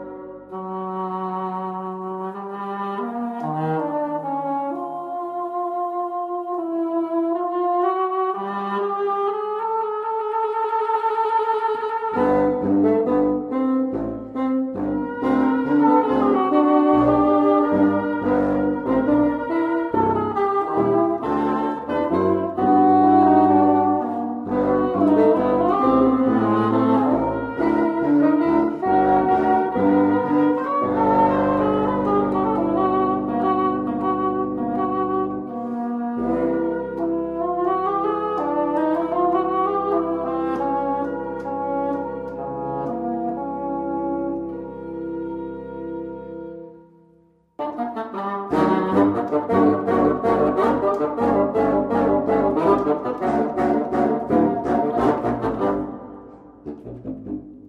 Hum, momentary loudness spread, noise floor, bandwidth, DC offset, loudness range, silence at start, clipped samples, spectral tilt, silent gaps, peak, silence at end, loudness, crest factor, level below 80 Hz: none; 12 LU; -57 dBFS; 5.2 kHz; under 0.1%; 9 LU; 0 s; under 0.1%; -9 dB/octave; none; -4 dBFS; 0 s; -21 LUFS; 16 dB; -50 dBFS